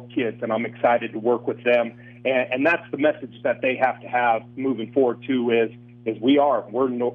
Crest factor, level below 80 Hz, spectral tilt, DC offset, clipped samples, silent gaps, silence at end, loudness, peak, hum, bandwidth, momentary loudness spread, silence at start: 16 dB; -70 dBFS; -8 dB/octave; under 0.1%; under 0.1%; none; 0 s; -23 LUFS; -6 dBFS; 60 Hz at -45 dBFS; 5.2 kHz; 7 LU; 0 s